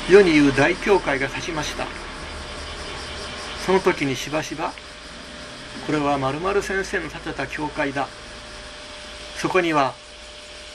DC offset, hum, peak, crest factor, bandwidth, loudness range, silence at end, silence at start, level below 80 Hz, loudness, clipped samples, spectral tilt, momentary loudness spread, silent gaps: under 0.1%; none; -2 dBFS; 22 dB; 13.5 kHz; 3 LU; 0 s; 0 s; -42 dBFS; -22 LUFS; under 0.1%; -4.5 dB/octave; 18 LU; none